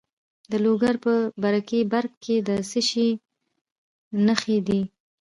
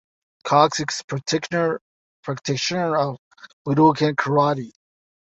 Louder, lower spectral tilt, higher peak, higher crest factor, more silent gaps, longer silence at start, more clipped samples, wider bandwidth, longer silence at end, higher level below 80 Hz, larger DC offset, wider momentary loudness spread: second, -24 LUFS vs -21 LUFS; about the same, -5 dB/octave vs -5 dB/octave; about the same, -4 dBFS vs -2 dBFS; about the same, 20 dB vs 20 dB; second, 2.17-2.21 s, 3.61-3.65 s, 3.72-4.11 s vs 1.04-1.08 s, 1.81-2.23 s, 3.18-3.31 s, 3.53-3.65 s; about the same, 0.5 s vs 0.45 s; neither; first, 11.5 kHz vs 8.2 kHz; second, 0.35 s vs 0.5 s; about the same, -64 dBFS vs -62 dBFS; neither; second, 6 LU vs 16 LU